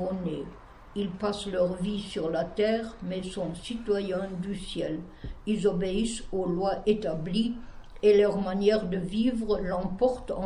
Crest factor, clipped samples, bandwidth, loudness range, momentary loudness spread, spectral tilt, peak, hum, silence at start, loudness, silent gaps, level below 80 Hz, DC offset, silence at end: 16 dB; under 0.1%; 11.5 kHz; 5 LU; 10 LU; -6 dB/octave; -12 dBFS; none; 0 s; -29 LUFS; none; -48 dBFS; under 0.1%; 0 s